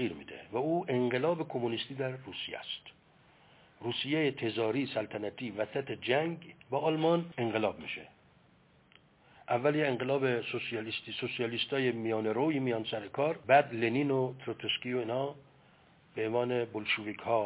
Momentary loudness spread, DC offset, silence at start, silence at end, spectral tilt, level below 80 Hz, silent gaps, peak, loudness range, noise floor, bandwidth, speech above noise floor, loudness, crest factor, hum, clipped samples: 9 LU; under 0.1%; 0 s; 0 s; -3.5 dB/octave; -72 dBFS; none; -12 dBFS; 5 LU; -64 dBFS; 4 kHz; 32 dB; -33 LUFS; 22 dB; none; under 0.1%